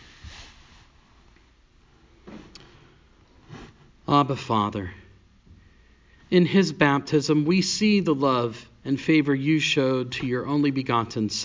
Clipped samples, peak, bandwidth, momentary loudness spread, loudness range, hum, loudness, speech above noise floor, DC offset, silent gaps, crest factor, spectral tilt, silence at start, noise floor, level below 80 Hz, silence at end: under 0.1%; -4 dBFS; 7.6 kHz; 23 LU; 7 LU; none; -23 LUFS; 35 dB; under 0.1%; none; 20 dB; -5.5 dB/octave; 0.25 s; -57 dBFS; -54 dBFS; 0 s